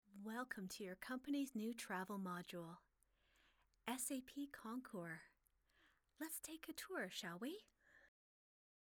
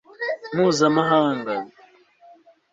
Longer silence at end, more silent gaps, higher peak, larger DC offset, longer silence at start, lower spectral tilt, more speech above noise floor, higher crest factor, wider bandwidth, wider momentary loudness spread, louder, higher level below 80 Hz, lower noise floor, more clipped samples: second, 0.9 s vs 1.05 s; neither; second, -30 dBFS vs -4 dBFS; neither; about the same, 0.1 s vs 0.2 s; second, -3.5 dB/octave vs -5 dB/octave; second, 31 dB vs 35 dB; about the same, 22 dB vs 18 dB; first, over 20 kHz vs 7.8 kHz; second, 9 LU vs 12 LU; second, -50 LUFS vs -21 LUFS; second, -84 dBFS vs -66 dBFS; first, -81 dBFS vs -54 dBFS; neither